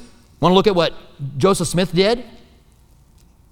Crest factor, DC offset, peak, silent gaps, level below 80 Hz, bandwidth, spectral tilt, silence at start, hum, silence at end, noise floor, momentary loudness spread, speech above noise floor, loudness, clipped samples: 20 dB; under 0.1%; 0 dBFS; none; -42 dBFS; 17 kHz; -5 dB/octave; 0 s; none; 1.25 s; -51 dBFS; 10 LU; 34 dB; -17 LUFS; under 0.1%